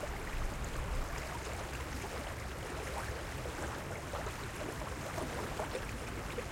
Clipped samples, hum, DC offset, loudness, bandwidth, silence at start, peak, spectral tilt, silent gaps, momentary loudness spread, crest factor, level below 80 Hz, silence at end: under 0.1%; none; under 0.1%; -41 LUFS; 16.5 kHz; 0 s; -24 dBFS; -4.5 dB/octave; none; 2 LU; 16 dB; -44 dBFS; 0 s